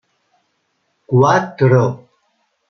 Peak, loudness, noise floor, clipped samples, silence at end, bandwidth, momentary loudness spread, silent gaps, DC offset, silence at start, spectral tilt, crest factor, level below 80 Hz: -2 dBFS; -14 LUFS; -67 dBFS; under 0.1%; 0.75 s; 6.6 kHz; 8 LU; none; under 0.1%; 1.1 s; -7.5 dB/octave; 16 dB; -58 dBFS